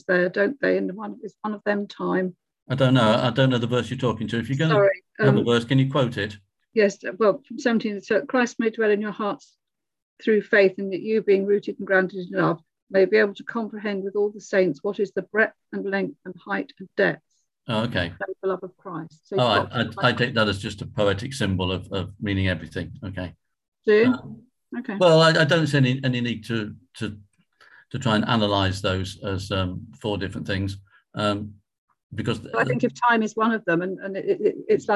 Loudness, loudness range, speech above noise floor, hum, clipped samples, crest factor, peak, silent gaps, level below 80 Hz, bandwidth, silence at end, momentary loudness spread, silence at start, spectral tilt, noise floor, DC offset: -23 LUFS; 6 LU; 33 dB; none; under 0.1%; 18 dB; -4 dBFS; 2.62-2.66 s, 10.02-10.17 s, 12.82-12.87 s, 23.68-23.72 s, 31.78-31.88 s, 32.03-32.10 s; -50 dBFS; 12 kHz; 0 s; 13 LU; 0.1 s; -6 dB/octave; -56 dBFS; under 0.1%